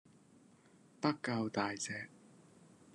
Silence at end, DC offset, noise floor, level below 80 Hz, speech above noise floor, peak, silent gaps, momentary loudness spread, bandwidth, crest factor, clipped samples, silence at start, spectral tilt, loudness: 0.25 s; under 0.1%; -65 dBFS; -84 dBFS; 27 dB; -18 dBFS; none; 8 LU; 11.5 kHz; 24 dB; under 0.1%; 1 s; -4.5 dB/octave; -38 LUFS